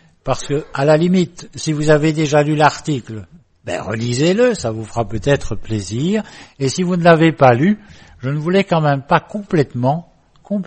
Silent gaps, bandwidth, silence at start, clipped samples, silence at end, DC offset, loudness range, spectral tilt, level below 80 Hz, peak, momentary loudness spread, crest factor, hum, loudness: none; 8.8 kHz; 0.25 s; under 0.1%; 0 s; under 0.1%; 4 LU; -6 dB/octave; -40 dBFS; 0 dBFS; 12 LU; 16 dB; none; -16 LUFS